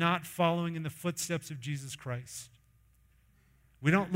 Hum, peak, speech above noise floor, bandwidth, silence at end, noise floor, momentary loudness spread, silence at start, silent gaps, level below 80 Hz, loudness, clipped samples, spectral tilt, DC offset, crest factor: none; -14 dBFS; 33 dB; 16 kHz; 0 s; -65 dBFS; 12 LU; 0 s; none; -66 dBFS; -34 LUFS; under 0.1%; -5 dB/octave; under 0.1%; 20 dB